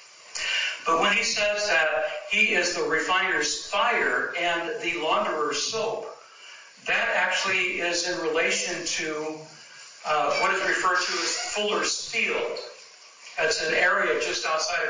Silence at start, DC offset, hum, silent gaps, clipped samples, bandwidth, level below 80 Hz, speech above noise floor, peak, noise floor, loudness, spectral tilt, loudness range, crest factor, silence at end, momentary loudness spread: 0 s; under 0.1%; none; none; under 0.1%; 7.8 kHz; -64 dBFS; 23 dB; -10 dBFS; -48 dBFS; -24 LUFS; -1 dB/octave; 3 LU; 16 dB; 0 s; 15 LU